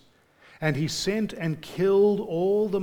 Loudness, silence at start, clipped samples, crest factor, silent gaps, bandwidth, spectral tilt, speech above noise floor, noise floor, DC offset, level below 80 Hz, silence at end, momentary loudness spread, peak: -25 LUFS; 0.6 s; under 0.1%; 16 dB; none; 17.5 kHz; -5.5 dB/octave; 33 dB; -58 dBFS; under 0.1%; -56 dBFS; 0 s; 9 LU; -10 dBFS